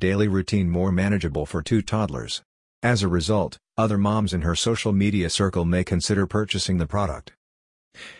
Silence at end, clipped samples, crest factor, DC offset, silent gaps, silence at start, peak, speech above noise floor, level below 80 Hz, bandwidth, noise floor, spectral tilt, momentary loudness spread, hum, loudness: 0.05 s; under 0.1%; 18 dB; under 0.1%; 2.45-2.82 s, 7.37-7.91 s; 0 s; -6 dBFS; over 68 dB; -44 dBFS; 11 kHz; under -90 dBFS; -5.5 dB/octave; 6 LU; none; -23 LUFS